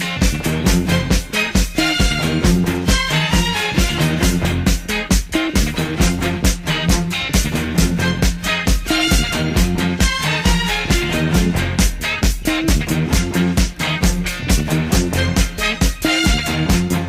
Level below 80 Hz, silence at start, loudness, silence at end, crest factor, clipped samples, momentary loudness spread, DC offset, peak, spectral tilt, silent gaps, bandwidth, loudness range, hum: -22 dBFS; 0 s; -17 LUFS; 0 s; 16 dB; under 0.1%; 3 LU; under 0.1%; 0 dBFS; -4 dB/octave; none; 16 kHz; 1 LU; none